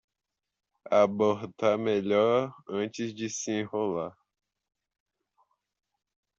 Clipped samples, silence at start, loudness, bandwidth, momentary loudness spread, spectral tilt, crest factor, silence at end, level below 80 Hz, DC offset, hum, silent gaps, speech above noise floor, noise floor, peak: under 0.1%; 0.9 s; -28 LUFS; 8 kHz; 10 LU; -5 dB/octave; 20 dB; 2.3 s; -74 dBFS; under 0.1%; none; none; 59 dB; -87 dBFS; -10 dBFS